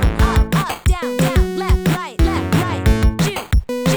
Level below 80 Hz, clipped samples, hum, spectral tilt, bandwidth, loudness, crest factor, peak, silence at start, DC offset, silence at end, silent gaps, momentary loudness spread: -20 dBFS; under 0.1%; none; -6 dB/octave; over 20 kHz; -18 LUFS; 12 dB; -4 dBFS; 0 s; under 0.1%; 0 s; none; 4 LU